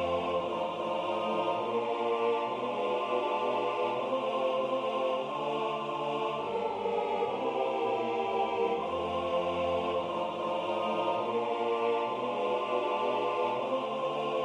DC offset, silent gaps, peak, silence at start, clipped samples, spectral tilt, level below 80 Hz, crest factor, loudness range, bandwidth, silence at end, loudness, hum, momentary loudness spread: under 0.1%; none; -18 dBFS; 0 s; under 0.1%; -5.5 dB/octave; -68 dBFS; 12 dB; 1 LU; 10.5 kHz; 0 s; -31 LUFS; none; 3 LU